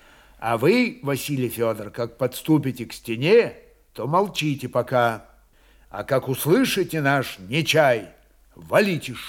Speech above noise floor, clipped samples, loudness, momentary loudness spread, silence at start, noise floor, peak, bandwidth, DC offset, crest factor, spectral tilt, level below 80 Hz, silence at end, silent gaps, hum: 33 dB; under 0.1%; -22 LUFS; 12 LU; 0.4 s; -55 dBFS; -4 dBFS; 18 kHz; under 0.1%; 18 dB; -5.5 dB/octave; -56 dBFS; 0 s; none; none